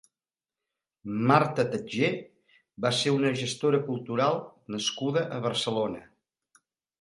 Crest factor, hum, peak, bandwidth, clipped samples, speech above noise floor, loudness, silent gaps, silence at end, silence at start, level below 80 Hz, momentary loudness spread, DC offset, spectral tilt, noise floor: 24 dB; none; -6 dBFS; 11.5 kHz; under 0.1%; over 63 dB; -28 LUFS; none; 0.95 s; 1.05 s; -68 dBFS; 11 LU; under 0.1%; -5 dB/octave; under -90 dBFS